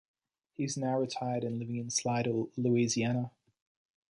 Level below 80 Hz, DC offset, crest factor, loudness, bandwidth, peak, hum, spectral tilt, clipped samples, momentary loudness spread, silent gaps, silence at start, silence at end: -72 dBFS; under 0.1%; 16 dB; -32 LUFS; 11.5 kHz; -16 dBFS; none; -5 dB/octave; under 0.1%; 8 LU; none; 0.6 s; 0.8 s